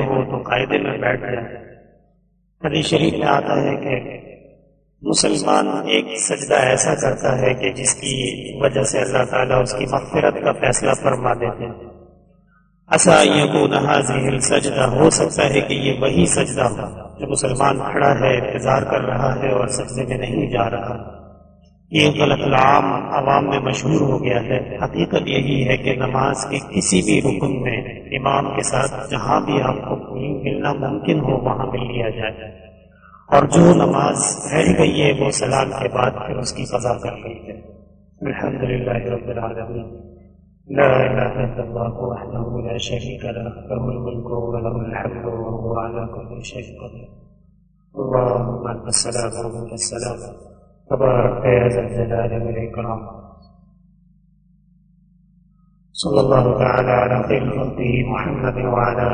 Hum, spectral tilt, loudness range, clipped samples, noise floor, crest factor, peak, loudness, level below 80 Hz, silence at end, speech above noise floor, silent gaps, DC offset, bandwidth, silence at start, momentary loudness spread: 50 Hz at -45 dBFS; -4.5 dB/octave; 9 LU; under 0.1%; -60 dBFS; 20 dB; 0 dBFS; -19 LUFS; -40 dBFS; 0 s; 42 dB; none; under 0.1%; 9.6 kHz; 0 s; 13 LU